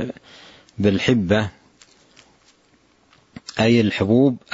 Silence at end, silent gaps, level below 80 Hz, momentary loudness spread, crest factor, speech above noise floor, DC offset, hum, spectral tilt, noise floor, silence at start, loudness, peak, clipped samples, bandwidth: 0.15 s; none; -52 dBFS; 20 LU; 18 dB; 40 dB; under 0.1%; none; -6.5 dB/octave; -58 dBFS; 0 s; -19 LUFS; -4 dBFS; under 0.1%; 8 kHz